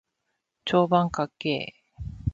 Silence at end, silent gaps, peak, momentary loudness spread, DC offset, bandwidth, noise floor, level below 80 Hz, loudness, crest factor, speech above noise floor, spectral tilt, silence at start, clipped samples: 0 s; none; -8 dBFS; 18 LU; under 0.1%; 7.6 kHz; -79 dBFS; -46 dBFS; -26 LUFS; 20 dB; 55 dB; -6.5 dB/octave; 0.65 s; under 0.1%